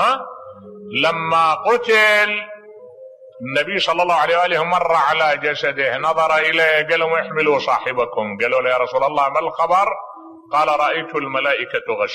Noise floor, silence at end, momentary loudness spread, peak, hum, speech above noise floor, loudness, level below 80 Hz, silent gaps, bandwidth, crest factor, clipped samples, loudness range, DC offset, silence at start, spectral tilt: -40 dBFS; 0 s; 8 LU; -4 dBFS; none; 23 dB; -17 LUFS; -62 dBFS; none; 13.5 kHz; 14 dB; under 0.1%; 2 LU; under 0.1%; 0 s; -3.5 dB/octave